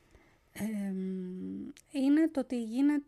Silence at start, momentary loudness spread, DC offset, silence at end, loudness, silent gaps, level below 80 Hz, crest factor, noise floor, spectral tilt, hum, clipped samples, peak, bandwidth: 0.55 s; 14 LU; under 0.1%; 0.05 s; -33 LUFS; none; -70 dBFS; 14 dB; -63 dBFS; -7 dB/octave; none; under 0.1%; -20 dBFS; 12.5 kHz